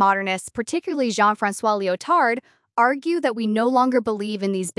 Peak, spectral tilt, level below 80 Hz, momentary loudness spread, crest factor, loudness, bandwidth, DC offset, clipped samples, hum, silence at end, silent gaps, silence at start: -6 dBFS; -4.5 dB/octave; -68 dBFS; 7 LU; 16 dB; -21 LUFS; 12 kHz; under 0.1%; under 0.1%; none; 0.1 s; none; 0 s